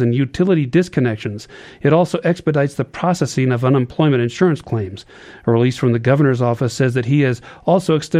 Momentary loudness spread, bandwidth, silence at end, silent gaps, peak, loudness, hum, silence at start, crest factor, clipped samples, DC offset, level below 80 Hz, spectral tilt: 9 LU; 12.5 kHz; 0 s; none; -2 dBFS; -17 LUFS; none; 0 s; 14 dB; under 0.1%; under 0.1%; -52 dBFS; -7 dB/octave